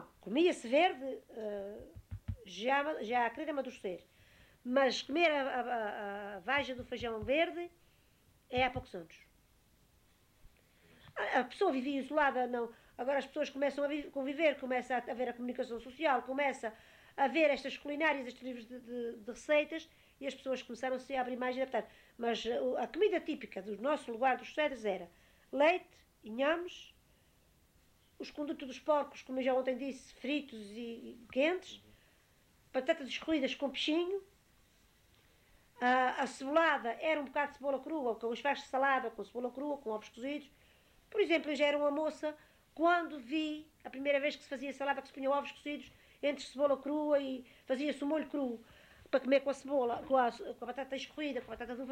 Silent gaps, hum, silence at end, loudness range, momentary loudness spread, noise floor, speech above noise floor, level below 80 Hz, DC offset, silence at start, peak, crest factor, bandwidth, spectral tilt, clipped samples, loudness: none; none; 0 s; 4 LU; 14 LU; -69 dBFS; 33 dB; -68 dBFS; under 0.1%; 0 s; -18 dBFS; 20 dB; 16 kHz; -4.5 dB/octave; under 0.1%; -35 LUFS